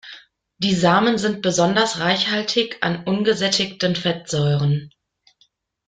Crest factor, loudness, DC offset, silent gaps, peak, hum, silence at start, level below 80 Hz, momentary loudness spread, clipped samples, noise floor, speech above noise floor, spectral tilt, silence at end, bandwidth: 18 dB; -19 LUFS; under 0.1%; none; -2 dBFS; none; 0.05 s; -56 dBFS; 6 LU; under 0.1%; -62 dBFS; 43 dB; -4.5 dB/octave; 1 s; 9.4 kHz